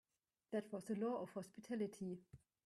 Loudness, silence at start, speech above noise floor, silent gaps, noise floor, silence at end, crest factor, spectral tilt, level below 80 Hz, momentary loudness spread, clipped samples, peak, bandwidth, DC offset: -47 LUFS; 0.5 s; 29 dB; none; -75 dBFS; 0.3 s; 16 dB; -7 dB/octave; -82 dBFS; 8 LU; under 0.1%; -30 dBFS; 13 kHz; under 0.1%